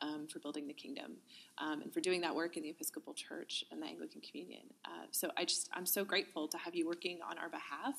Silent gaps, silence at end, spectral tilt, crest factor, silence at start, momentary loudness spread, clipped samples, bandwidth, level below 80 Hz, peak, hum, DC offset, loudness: none; 0 s; -2 dB/octave; 24 dB; 0 s; 14 LU; under 0.1%; 15 kHz; under -90 dBFS; -20 dBFS; none; under 0.1%; -41 LUFS